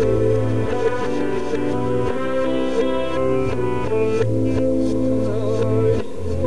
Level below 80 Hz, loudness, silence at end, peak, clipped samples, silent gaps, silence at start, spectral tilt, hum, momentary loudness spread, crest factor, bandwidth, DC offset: -38 dBFS; -21 LUFS; 0 s; -6 dBFS; under 0.1%; none; 0 s; -7.5 dB/octave; none; 4 LU; 12 dB; 11 kHz; 6%